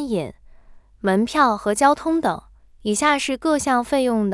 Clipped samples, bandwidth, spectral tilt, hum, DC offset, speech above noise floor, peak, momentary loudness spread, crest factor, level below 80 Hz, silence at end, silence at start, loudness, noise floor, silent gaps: under 0.1%; 12 kHz; -4 dB/octave; none; under 0.1%; 27 dB; -2 dBFS; 9 LU; 18 dB; -50 dBFS; 0 s; 0 s; -20 LUFS; -46 dBFS; none